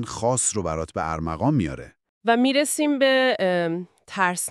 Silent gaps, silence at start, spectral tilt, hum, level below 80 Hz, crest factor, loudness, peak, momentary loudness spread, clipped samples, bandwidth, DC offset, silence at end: 2.09-2.21 s; 0 s; -4 dB/octave; none; -48 dBFS; 18 dB; -22 LUFS; -6 dBFS; 10 LU; under 0.1%; 13.5 kHz; under 0.1%; 0 s